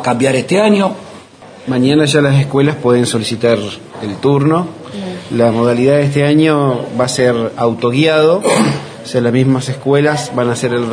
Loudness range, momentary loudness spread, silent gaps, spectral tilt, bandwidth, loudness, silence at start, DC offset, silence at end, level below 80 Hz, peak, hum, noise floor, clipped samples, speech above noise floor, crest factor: 2 LU; 10 LU; none; -6 dB/octave; 10.5 kHz; -13 LUFS; 0 s; under 0.1%; 0 s; -50 dBFS; 0 dBFS; none; -36 dBFS; under 0.1%; 24 dB; 12 dB